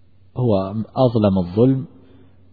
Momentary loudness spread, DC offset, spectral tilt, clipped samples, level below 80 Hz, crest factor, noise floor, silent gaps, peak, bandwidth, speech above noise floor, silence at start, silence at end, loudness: 11 LU; 0.3%; -12 dB/octave; under 0.1%; -50 dBFS; 16 dB; -49 dBFS; none; -4 dBFS; 4.9 kHz; 32 dB; 0.35 s; 0.65 s; -19 LUFS